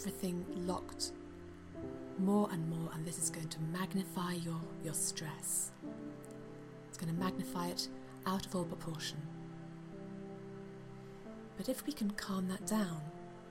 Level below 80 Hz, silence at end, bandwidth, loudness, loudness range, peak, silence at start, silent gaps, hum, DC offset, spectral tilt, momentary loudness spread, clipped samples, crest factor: -64 dBFS; 0 s; 16.5 kHz; -40 LUFS; 6 LU; -22 dBFS; 0 s; none; none; under 0.1%; -4.5 dB/octave; 14 LU; under 0.1%; 18 dB